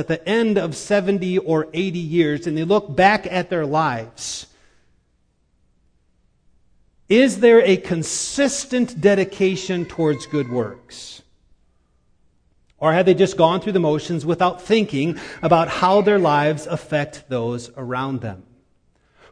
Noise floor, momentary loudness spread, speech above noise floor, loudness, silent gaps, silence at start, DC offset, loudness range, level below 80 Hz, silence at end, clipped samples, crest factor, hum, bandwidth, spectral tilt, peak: -64 dBFS; 12 LU; 45 dB; -19 LUFS; none; 0 s; under 0.1%; 7 LU; -54 dBFS; 0.9 s; under 0.1%; 20 dB; none; 10.5 kHz; -5 dB/octave; 0 dBFS